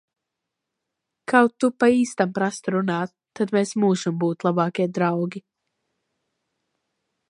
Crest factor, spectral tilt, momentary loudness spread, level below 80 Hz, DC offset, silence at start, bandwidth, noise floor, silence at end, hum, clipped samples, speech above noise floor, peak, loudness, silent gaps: 22 dB; -6 dB/octave; 10 LU; -70 dBFS; under 0.1%; 1.3 s; 11 kHz; -83 dBFS; 1.9 s; none; under 0.1%; 62 dB; -2 dBFS; -22 LUFS; none